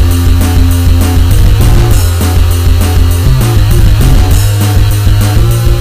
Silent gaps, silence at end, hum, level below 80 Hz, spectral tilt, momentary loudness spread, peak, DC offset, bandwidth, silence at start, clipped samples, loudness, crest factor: none; 0 s; none; -8 dBFS; -5.5 dB/octave; 1 LU; 0 dBFS; under 0.1%; 16 kHz; 0 s; 4%; -8 LUFS; 6 dB